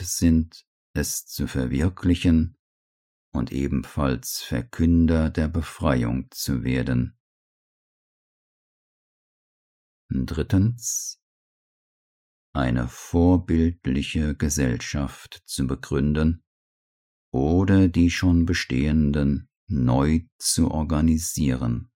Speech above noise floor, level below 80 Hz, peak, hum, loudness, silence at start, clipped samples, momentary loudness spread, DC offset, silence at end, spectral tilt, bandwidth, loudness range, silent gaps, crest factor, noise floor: over 68 dB; -34 dBFS; -8 dBFS; none; -23 LUFS; 0 s; under 0.1%; 10 LU; under 0.1%; 0.15 s; -5.5 dB/octave; 16.5 kHz; 7 LU; 0.67-0.94 s, 2.59-3.32 s, 7.20-10.09 s, 11.22-12.53 s, 16.47-17.32 s, 19.57-19.67 s, 20.32-20.39 s; 16 dB; under -90 dBFS